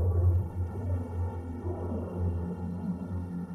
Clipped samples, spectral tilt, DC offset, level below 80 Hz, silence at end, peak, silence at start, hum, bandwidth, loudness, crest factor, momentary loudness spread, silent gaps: under 0.1%; -11 dB/octave; under 0.1%; -42 dBFS; 0 s; -18 dBFS; 0 s; none; 2.9 kHz; -33 LUFS; 14 dB; 8 LU; none